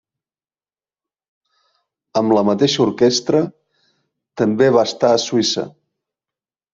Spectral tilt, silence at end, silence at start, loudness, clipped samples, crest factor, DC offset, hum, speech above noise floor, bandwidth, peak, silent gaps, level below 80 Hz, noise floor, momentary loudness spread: -4.5 dB/octave; 1.05 s; 2.15 s; -16 LUFS; under 0.1%; 18 dB; under 0.1%; none; over 74 dB; 7.8 kHz; -2 dBFS; none; -60 dBFS; under -90 dBFS; 10 LU